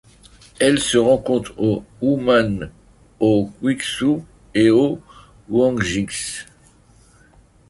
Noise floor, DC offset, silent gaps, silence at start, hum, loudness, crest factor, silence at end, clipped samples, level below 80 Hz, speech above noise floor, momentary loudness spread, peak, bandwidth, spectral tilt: -51 dBFS; under 0.1%; none; 0.6 s; none; -19 LUFS; 18 dB; 1.25 s; under 0.1%; -46 dBFS; 33 dB; 10 LU; -2 dBFS; 11.5 kHz; -5 dB/octave